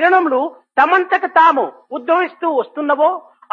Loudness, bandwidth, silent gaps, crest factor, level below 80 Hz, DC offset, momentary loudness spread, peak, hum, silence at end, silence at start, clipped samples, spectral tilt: -15 LUFS; 7 kHz; none; 16 dB; -80 dBFS; under 0.1%; 8 LU; 0 dBFS; none; 0.35 s; 0 s; under 0.1%; -4.5 dB/octave